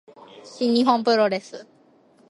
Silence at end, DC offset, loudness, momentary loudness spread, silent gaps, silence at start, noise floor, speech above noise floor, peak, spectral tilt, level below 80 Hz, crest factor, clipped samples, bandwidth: 0.65 s; under 0.1%; -21 LUFS; 23 LU; none; 0.35 s; -56 dBFS; 35 dB; -6 dBFS; -5 dB/octave; -74 dBFS; 18 dB; under 0.1%; 11.5 kHz